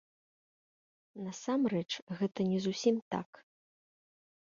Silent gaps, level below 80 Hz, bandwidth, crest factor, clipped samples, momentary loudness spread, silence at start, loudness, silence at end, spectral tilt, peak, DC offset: 2.02-2.07 s, 3.02-3.11 s; -78 dBFS; 7.6 kHz; 20 dB; under 0.1%; 13 LU; 1.15 s; -34 LUFS; 1.35 s; -5.5 dB/octave; -16 dBFS; under 0.1%